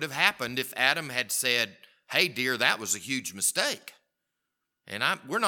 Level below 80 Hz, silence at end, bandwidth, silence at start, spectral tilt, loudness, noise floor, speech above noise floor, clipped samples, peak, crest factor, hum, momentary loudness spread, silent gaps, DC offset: -76 dBFS; 0 s; 19 kHz; 0 s; -1 dB/octave; -26 LUFS; -83 dBFS; 55 dB; under 0.1%; -4 dBFS; 26 dB; none; 7 LU; none; under 0.1%